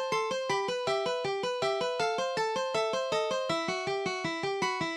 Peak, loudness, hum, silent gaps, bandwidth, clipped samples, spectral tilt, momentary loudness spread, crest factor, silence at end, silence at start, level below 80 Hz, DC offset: -16 dBFS; -31 LUFS; none; none; 13.5 kHz; under 0.1%; -3 dB/octave; 2 LU; 14 dB; 0 s; 0 s; -72 dBFS; under 0.1%